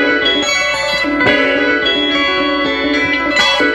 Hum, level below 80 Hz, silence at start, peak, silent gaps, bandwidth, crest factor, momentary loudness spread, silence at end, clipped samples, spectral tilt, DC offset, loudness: none; -40 dBFS; 0 s; 0 dBFS; none; 13 kHz; 14 dB; 3 LU; 0 s; under 0.1%; -2.5 dB/octave; under 0.1%; -12 LUFS